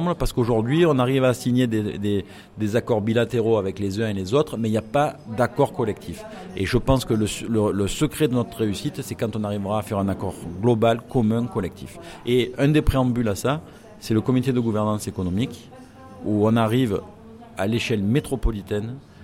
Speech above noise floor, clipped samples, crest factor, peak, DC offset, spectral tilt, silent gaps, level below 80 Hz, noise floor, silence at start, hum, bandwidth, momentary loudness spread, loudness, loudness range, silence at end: 20 dB; under 0.1%; 18 dB; -4 dBFS; under 0.1%; -6.5 dB/octave; none; -38 dBFS; -42 dBFS; 0 s; none; 16.5 kHz; 10 LU; -23 LUFS; 3 LU; 0 s